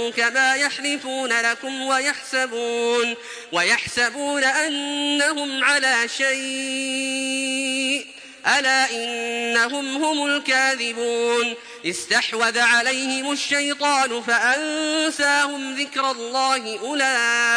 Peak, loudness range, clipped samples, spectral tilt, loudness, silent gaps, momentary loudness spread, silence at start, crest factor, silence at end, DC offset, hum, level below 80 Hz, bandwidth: -6 dBFS; 2 LU; under 0.1%; -0.5 dB/octave; -20 LUFS; none; 7 LU; 0 s; 16 dB; 0 s; under 0.1%; none; -68 dBFS; 10.5 kHz